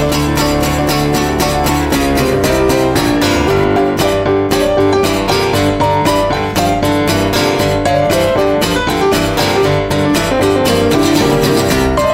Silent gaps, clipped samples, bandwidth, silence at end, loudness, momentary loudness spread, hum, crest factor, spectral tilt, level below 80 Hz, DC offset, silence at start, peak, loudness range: none; under 0.1%; 16.5 kHz; 0 s; -12 LUFS; 2 LU; none; 12 dB; -5 dB/octave; -28 dBFS; under 0.1%; 0 s; 0 dBFS; 1 LU